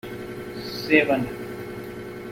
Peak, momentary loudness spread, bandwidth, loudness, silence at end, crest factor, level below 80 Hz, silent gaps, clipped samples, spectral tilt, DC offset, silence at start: -2 dBFS; 17 LU; 16.5 kHz; -25 LUFS; 0 s; 24 dB; -54 dBFS; none; under 0.1%; -5.5 dB/octave; under 0.1%; 0.05 s